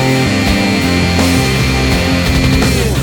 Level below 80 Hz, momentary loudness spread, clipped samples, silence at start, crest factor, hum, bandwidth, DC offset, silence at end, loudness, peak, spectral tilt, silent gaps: -20 dBFS; 1 LU; under 0.1%; 0 s; 12 dB; none; 19 kHz; under 0.1%; 0 s; -12 LUFS; 0 dBFS; -5 dB/octave; none